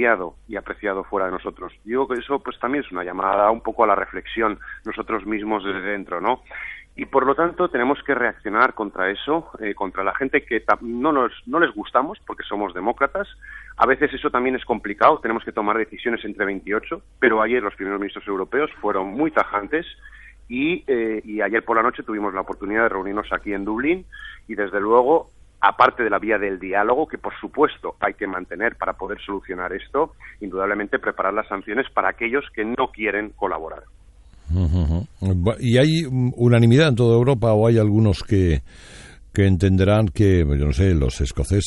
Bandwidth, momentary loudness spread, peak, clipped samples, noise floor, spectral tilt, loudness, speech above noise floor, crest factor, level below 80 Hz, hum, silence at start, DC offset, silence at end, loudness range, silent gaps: 11.5 kHz; 11 LU; -2 dBFS; under 0.1%; -47 dBFS; -7 dB/octave; -21 LUFS; 26 dB; 20 dB; -38 dBFS; none; 0 s; under 0.1%; 0 s; 7 LU; none